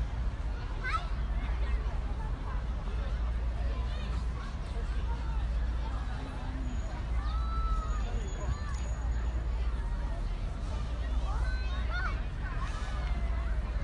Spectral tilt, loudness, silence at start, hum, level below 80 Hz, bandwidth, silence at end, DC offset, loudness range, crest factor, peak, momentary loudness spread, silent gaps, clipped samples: -6 dB/octave; -36 LUFS; 0 s; none; -32 dBFS; 9 kHz; 0 s; under 0.1%; 1 LU; 12 dB; -20 dBFS; 4 LU; none; under 0.1%